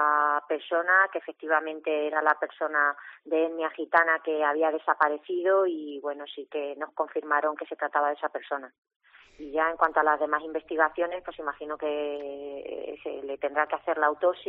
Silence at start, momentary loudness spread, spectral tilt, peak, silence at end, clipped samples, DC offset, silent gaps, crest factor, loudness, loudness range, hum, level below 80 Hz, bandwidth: 0 s; 13 LU; 0.5 dB/octave; -6 dBFS; 0 s; under 0.1%; under 0.1%; 8.78-8.82 s, 8.96-9.00 s; 22 dB; -27 LUFS; 5 LU; none; -70 dBFS; 5.2 kHz